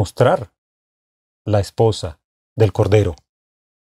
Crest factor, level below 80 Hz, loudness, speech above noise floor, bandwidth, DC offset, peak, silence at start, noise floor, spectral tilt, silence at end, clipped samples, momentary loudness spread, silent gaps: 18 dB; -44 dBFS; -18 LUFS; over 74 dB; 12.5 kHz; under 0.1%; -2 dBFS; 0 s; under -90 dBFS; -7 dB/octave; 0.8 s; under 0.1%; 18 LU; 0.58-1.45 s, 2.24-2.56 s